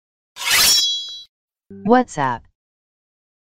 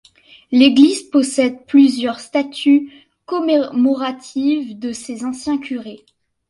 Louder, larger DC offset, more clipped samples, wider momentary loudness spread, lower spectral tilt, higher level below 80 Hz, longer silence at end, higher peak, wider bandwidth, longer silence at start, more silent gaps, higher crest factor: about the same, -16 LUFS vs -16 LUFS; neither; neither; first, 19 LU vs 14 LU; second, -1.5 dB/octave vs -3.5 dB/octave; first, -52 dBFS vs -62 dBFS; first, 1.1 s vs 0.55 s; about the same, 0 dBFS vs 0 dBFS; first, 16.5 kHz vs 11.5 kHz; second, 0.35 s vs 0.5 s; first, 1.29-1.48 s vs none; about the same, 20 dB vs 16 dB